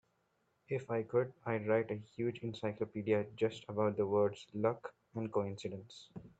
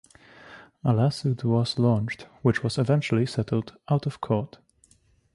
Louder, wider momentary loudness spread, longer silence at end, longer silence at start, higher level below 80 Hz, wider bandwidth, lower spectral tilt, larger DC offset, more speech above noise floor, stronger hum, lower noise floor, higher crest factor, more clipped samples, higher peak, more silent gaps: second, -37 LUFS vs -26 LUFS; first, 11 LU vs 6 LU; second, 0.1 s vs 0.9 s; first, 0.7 s vs 0.45 s; second, -76 dBFS vs -56 dBFS; second, 8.2 kHz vs 11.5 kHz; about the same, -7.5 dB/octave vs -7 dB/octave; neither; first, 42 dB vs 38 dB; neither; first, -78 dBFS vs -62 dBFS; about the same, 20 dB vs 18 dB; neither; second, -18 dBFS vs -8 dBFS; neither